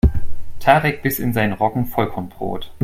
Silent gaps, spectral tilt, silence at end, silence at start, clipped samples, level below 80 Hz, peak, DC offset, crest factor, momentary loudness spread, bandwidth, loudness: none; -6.5 dB/octave; 0 s; 0.05 s; under 0.1%; -28 dBFS; 0 dBFS; under 0.1%; 16 dB; 12 LU; 16.5 kHz; -20 LUFS